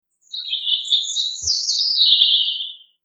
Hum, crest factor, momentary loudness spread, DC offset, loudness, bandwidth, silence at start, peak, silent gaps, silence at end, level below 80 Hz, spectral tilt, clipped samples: none; 18 dB; 15 LU; under 0.1%; -16 LUFS; 9 kHz; 0.3 s; -2 dBFS; none; 0.3 s; -58 dBFS; 3.5 dB/octave; under 0.1%